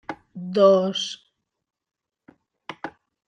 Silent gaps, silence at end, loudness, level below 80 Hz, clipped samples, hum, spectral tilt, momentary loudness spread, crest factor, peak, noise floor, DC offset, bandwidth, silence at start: none; 0.4 s; -20 LUFS; -72 dBFS; under 0.1%; none; -5 dB/octave; 23 LU; 20 dB; -4 dBFS; -58 dBFS; under 0.1%; 9.2 kHz; 0.1 s